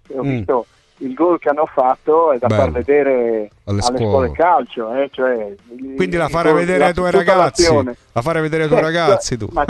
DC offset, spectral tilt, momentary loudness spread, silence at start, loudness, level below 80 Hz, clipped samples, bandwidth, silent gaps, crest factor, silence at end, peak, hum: under 0.1%; -5.5 dB/octave; 9 LU; 0.1 s; -16 LUFS; -40 dBFS; under 0.1%; 12 kHz; none; 14 dB; 0 s; -2 dBFS; none